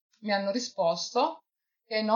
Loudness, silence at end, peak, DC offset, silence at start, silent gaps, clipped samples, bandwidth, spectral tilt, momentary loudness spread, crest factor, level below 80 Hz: -29 LUFS; 0 s; -12 dBFS; under 0.1%; 0.2 s; none; under 0.1%; 7.4 kHz; -3.5 dB/octave; 5 LU; 18 dB; -84 dBFS